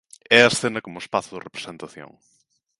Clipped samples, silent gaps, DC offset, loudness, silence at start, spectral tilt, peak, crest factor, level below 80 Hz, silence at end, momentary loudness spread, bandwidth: under 0.1%; none; under 0.1%; -19 LUFS; 0.3 s; -3 dB/octave; 0 dBFS; 24 dB; -64 dBFS; 0.75 s; 22 LU; 11.5 kHz